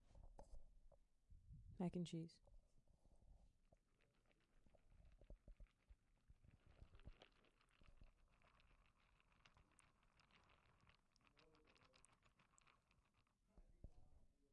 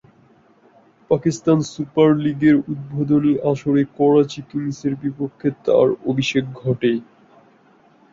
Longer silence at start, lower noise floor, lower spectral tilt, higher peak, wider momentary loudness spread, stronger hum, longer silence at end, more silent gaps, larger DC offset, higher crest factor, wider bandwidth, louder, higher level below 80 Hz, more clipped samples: second, 0 s vs 1.1 s; first, -84 dBFS vs -53 dBFS; about the same, -7 dB/octave vs -7 dB/octave; second, -36 dBFS vs -2 dBFS; first, 19 LU vs 9 LU; neither; second, 0 s vs 1.1 s; neither; neither; first, 26 dB vs 16 dB; first, 9.4 kHz vs 7.6 kHz; second, -52 LUFS vs -19 LUFS; second, -72 dBFS vs -56 dBFS; neither